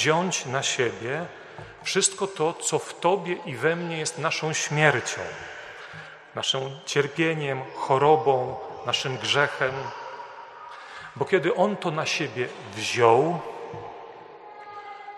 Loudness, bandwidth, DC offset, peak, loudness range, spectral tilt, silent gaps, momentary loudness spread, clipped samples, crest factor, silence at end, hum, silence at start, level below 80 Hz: -25 LUFS; 13 kHz; under 0.1%; -2 dBFS; 3 LU; -3.5 dB/octave; none; 19 LU; under 0.1%; 24 dB; 0 s; none; 0 s; -68 dBFS